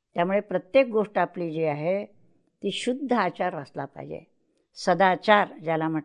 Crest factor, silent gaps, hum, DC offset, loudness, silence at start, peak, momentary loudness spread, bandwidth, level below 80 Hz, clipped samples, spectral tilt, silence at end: 20 dB; none; none; under 0.1%; -25 LUFS; 0.15 s; -6 dBFS; 15 LU; 10 kHz; -72 dBFS; under 0.1%; -5.5 dB/octave; 0 s